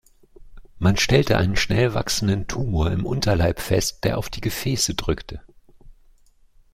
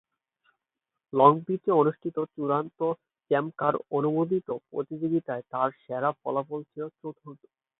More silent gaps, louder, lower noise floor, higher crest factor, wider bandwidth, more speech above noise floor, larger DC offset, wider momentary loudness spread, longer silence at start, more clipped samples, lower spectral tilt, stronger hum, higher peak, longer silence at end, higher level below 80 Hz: neither; first, -22 LUFS vs -27 LUFS; second, -54 dBFS vs -87 dBFS; about the same, 20 dB vs 24 dB; first, 16.5 kHz vs 4 kHz; second, 33 dB vs 60 dB; neither; second, 9 LU vs 16 LU; second, 0.4 s vs 1.15 s; neither; second, -4.5 dB/octave vs -11.5 dB/octave; neither; about the same, -2 dBFS vs -4 dBFS; first, 0.8 s vs 0.45 s; first, -36 dBFS vs -76 dBFS